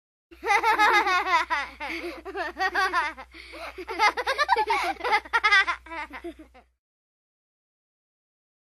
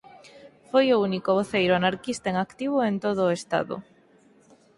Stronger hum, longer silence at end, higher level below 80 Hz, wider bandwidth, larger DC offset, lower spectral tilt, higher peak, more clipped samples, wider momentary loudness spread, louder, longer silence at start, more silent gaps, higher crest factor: neither; first, 2.15 s vs 0.95 s; first, -56 dBFS vs -62 dBFS; first, 14 kHz vs 11.5 kHz; neither; second, -1.5 dB/octave vs -5.5 dB/octave; first, -4 dBFS vs -8 dBFS; neither; first, 18 LU vs 7 LU; about the same, -23 LUFS vs -25 LUFS; first, 0.4 s vs 0.15 s; neither; about the same, 22 dB vs 18 dB